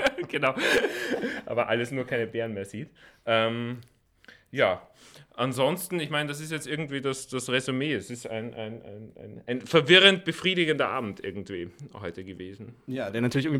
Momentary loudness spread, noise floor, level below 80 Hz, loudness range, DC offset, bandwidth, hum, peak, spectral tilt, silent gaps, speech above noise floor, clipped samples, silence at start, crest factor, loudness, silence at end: 17 LU; -56 dBFS; -64 dBFS; 7 LU; under 0.1%; 17 kHz; none; -2 dBFS; -4.5 dB/octave; none; 28 dB; under 0.1%; 0 s; 24 dB; -26 LUFS; 0 s